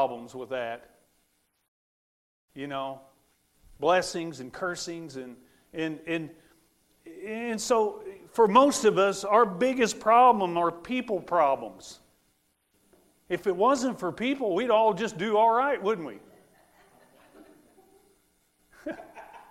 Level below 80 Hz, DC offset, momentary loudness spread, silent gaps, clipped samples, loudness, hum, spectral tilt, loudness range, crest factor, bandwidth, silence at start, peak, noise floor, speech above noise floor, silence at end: -66 dBFS; under 0.1%; 21 LU; 1.68-2.48 s; under 0.1%; -26 LUFS; none; -4 dB/octave; 13 LU; 22 dB; 15.5 kHz; 0 s; -6 dBFS; -72 dBFS; 46 dB; 0.15 s